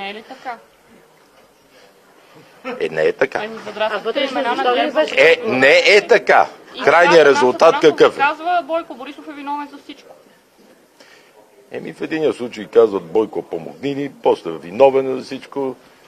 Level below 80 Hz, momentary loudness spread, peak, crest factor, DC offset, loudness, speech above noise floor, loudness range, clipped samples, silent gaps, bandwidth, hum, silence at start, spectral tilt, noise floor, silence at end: -64 dBFS; 20 LU; 0 dBFS; 18 dB; under 0.1%; -15 LUFS; 34 dB; 15 LU; under 0.1%; none; 13.5 kHz; none; 0 s; -4 dB/octave; -51 dBFS; 0.35 s